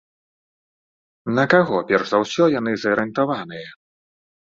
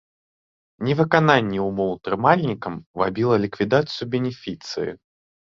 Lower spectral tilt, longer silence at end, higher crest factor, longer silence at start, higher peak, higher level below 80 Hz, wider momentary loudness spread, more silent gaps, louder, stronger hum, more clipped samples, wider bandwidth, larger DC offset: about the same, -6 dB/octave vs -7 dB/octave; first, 0.9 s vs 0.6 s; about the same, 20 dB vs 22 dB; first, 1.25 s vs 0.8 s; about the same, -2 dBFS vs 0 dBFS; second, -62 dBFS vs -56 dBFS; first, 17 LU vs 12 LU; second, none vs 2.86-2.94 s; first, -19 LUFS vs -22 LUFS; neither; neither; about the same, 7.6 kHz vs 7.4 kHz; neither